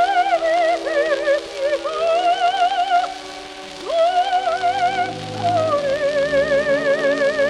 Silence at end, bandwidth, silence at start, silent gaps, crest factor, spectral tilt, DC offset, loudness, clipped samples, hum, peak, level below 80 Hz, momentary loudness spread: 0 s; 11.5 kHz; 0 s; none; 12 dB; -4 dB/octave; under 0.1%; -19 LUFS; under 0.1%; none; -6 dBFS; -52 dBFS; 7 LU